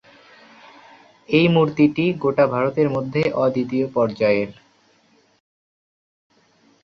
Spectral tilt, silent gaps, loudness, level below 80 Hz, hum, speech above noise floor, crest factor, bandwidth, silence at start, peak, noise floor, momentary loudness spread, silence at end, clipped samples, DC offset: -8 dB/octave; none; -19 LUFS; -58 dBFS; none; 40 dB; 18 dB; 7 kHz; 1.3 s; -4 dBFS; -59 dBFS; 6 LU; 2.3 s; under 0.1%; under 0.1%